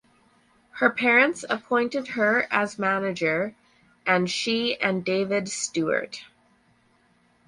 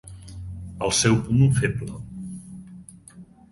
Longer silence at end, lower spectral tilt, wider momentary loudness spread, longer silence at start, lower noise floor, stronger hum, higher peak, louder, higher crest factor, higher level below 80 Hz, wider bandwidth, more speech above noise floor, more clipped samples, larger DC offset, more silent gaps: first, 1.25 s vs 0.25 s; second, -3.5 dB/octave vs -5 dB/octave; second, 10 LU vs 23 LU; first, 0.75 s vs 0.05 s; first, -63 dBFS vs -47 dBFS; neither; about the same, -6 dBFS vs -6 dBFS; second, -24 LUFS vs -21 LUFS; about the same, 20 dB vs 20 dB; second, -68 dBFS vs -44 dBFS; about the same, 11.5 kHz vs 11.5 kHz; first, 39 dB vs 27 dB; neither; neither; neither